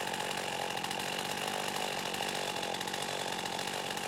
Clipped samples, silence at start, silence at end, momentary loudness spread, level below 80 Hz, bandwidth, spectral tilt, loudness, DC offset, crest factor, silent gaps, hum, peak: under 0.1%; 0 s; 0 s; 1 LU; -70 dBFS; 17 kHz; -2 dB/octave; -35 LUFS; under 0.1%; 16 dB; none; none; -20 dBFS